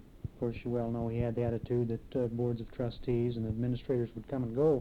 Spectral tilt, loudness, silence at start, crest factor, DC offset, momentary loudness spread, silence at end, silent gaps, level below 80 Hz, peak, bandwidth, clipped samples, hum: -10 dB/octave; -34 LUFS; 0 s; 14 dB; under 0.1%; 5 LU; 0 s; none; -50 dBFS; -18 dBFS; 4.9 kHz; under 0.1%; none